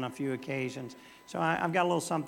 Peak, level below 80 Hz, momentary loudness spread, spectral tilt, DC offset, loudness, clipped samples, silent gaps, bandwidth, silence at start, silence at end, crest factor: -14 dBFS; -74 dBFS; 15 LU; -5 dB/octave; under 0.1%; -32 LUFS; under 0.1%; none; 17.5 kHz; 0 s; 0 s; 20 dB